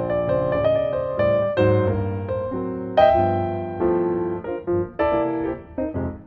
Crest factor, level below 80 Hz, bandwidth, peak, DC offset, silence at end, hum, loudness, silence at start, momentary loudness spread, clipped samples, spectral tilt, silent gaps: 18 dB; -42 dBFS; 5.6 kHz; -2 dBFS; under 0.1%; 0 s; none; -22 LUFS; 0 s; 9 LU; under 0.1%; -10 dB/octave; none